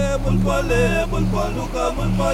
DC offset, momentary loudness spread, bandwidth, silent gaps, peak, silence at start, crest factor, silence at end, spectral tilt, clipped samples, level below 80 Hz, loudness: under 0.1%; 5 LU; 15.5 kHz; none; -6 dBFS; 0 s; 12 dB; 0 s; -6 dB/octave; under 0.1%; -26 dBFS; -20 LUFS